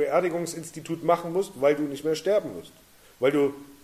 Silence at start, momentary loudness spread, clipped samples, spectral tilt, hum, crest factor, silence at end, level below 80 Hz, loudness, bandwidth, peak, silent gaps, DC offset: 0 s; 11 LU; under 0.1%; -5 dB/octave; none; 18 dB; 0.1 s; -66 dBFS; -26 LUFS; 15.5 kHz; -8 dBFS; none; under 0.1%